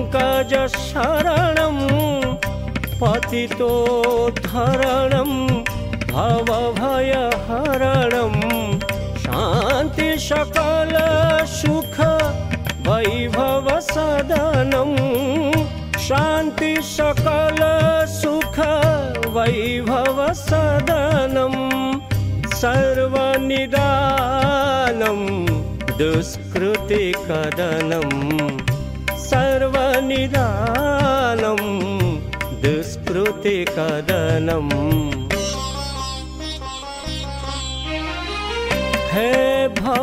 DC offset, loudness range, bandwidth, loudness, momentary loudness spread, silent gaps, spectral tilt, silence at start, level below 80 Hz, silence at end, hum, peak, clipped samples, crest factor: under 0.1%; 3 LU; 16 kHz; -19 LUFS; 7 LU; none; -5.5 dB/octave; 0 s; -34 dBFS; 0 s; none; -4 dBFS; under 0.1%; 14 dB